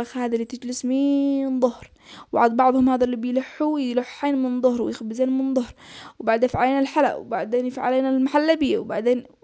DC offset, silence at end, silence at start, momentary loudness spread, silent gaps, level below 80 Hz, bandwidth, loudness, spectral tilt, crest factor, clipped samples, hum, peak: under 0.1%; 0.2 s; 0 s; 8 LU; none; -56 dBFS; 8 kHz; -22 LUFS; -5.5 dB/octave; 16 dB; under 0.1%; none; -6 dBFS